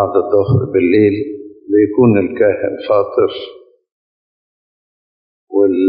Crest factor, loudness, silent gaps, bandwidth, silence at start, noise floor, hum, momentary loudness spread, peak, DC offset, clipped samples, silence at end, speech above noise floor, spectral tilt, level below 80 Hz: 14 dB; -14 LUFS; 3.92-5.47 s; 5 kHz; 0 s; under -90 dBFS; none; 12 LU; 0 dBFS; under 0.1%; under 0.1%; 0 s; over 77 dB; -12 dB/octave; -52 dBFS